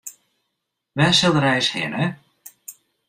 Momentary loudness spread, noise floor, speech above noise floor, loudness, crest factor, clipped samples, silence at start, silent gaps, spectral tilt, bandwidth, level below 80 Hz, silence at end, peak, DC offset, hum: 25 LU; -78 dBFS; 59 dB; -18 LUFS; 18 dB; under 0.1%; 0.05 s; none; -4 dB/octave; 16 kHz; -56 dBFS; 0.35 s; -4 dBFS; under 0.1%; none